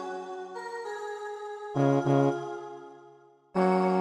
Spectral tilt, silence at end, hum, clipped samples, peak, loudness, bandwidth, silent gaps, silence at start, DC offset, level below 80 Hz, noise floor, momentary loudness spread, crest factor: -8 dB/octave; 0 s; none; under 0.1%; -12 dBFS; -29 LUFS; 10.5 kHz; none; 0 s; under 0.1%; -74 dBFS; -56 dBFS; 16 LU; 18 dB